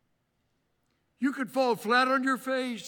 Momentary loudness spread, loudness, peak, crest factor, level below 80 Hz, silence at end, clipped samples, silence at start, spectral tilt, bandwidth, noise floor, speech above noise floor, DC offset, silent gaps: 8 LU; -27 LUFS; -12 dBFS; 18 dB; -82 dBFS; 0 s; under 0.1%; 1.2 s; -4 dB/octave; 19 kHz; -75 dBFS; 48 dB; under 0.1%; none